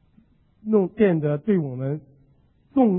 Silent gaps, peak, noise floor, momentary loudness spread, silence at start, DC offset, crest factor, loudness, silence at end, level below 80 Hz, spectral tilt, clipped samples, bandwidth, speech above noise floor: none; -6 dBFS; -59 dBFS; 11 LU; 0.65 s; under 0.1%; 18 dB; -23 LUFS; 0 s; -60 dBFS; -13 dB/octave; under 0.1%; 3.8 kHz; 37 dB